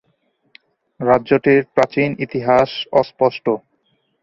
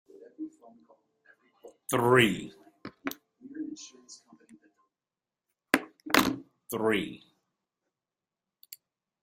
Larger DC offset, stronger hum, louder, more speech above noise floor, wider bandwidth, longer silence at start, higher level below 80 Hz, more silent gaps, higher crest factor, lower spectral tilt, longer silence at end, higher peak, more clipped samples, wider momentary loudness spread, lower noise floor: neither; neither; first, -17 LUFS vs -29 LUFS; second, 49 dB vs over 64 dB; second, 7.4 kHz vs 16 kHz; first, 1 s vs 0.15 s; first, -54 dBFS vs -68 dBFS; neither; second, 18 dB vs 30 dB; first, -7 dB/octave vs -4.5 dB/octave; first, 0.65 s vs 0.5 s; about the same, 0 dBFS vs -2 dBFS; neither; second, 8 LU vs 26 LU; second, -65 dBFS vs under -90 dBFS